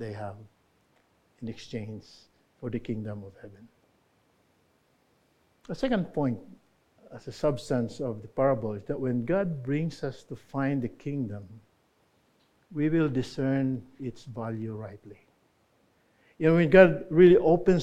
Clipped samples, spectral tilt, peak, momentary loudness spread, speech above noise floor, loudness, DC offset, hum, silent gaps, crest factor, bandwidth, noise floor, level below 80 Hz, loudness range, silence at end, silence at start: under 0.1%; -8 dB/octave; -2 dBFS; 22 LU; 41 dB; -27 LUFS; under 0.1%; none; none; 26 dB; 9.4 kHz; -68 dBFS; -54 dBFS; 14 LU; 0 s; 0 s